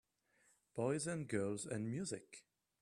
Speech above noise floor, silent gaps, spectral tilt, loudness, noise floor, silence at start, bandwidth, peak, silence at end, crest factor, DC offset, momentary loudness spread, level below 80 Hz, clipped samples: 35 dB; none; -5.5 dB/octave; -43 LUFS; -77 dBFS; 0.75 s; 13.5 kHz; -24 dBFS; 0.4 s; 20 dB; under 0.1%; 13 LU; -78 dBFS; under 0.1%